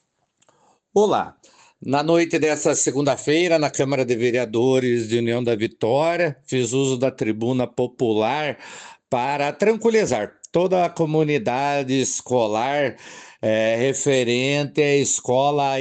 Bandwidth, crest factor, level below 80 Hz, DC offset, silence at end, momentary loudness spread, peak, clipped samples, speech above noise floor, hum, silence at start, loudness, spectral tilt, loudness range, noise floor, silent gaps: 9.4 kHz; 16 dB; -64 dBFS; under 0.1%; 0 s; 6 LU; -6 dBFS; under 0.1%; 43 dB; none; 0.95 s; -21 LUFS; -4.5 dB/octave; 2 LU; -63 dBFS; none